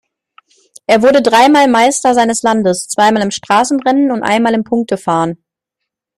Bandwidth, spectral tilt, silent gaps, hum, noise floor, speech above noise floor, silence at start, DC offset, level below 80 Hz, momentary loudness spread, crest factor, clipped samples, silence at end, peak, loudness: 15.5 kHz; -4 dB/octave; none; none; -78 dBFS; 67 dB; 0.9 s; under 0.1%; -54 dBFS; 8 LU; 12 dB; under 0.1%; 0.85 s; 0 dBFS; -11 LUFS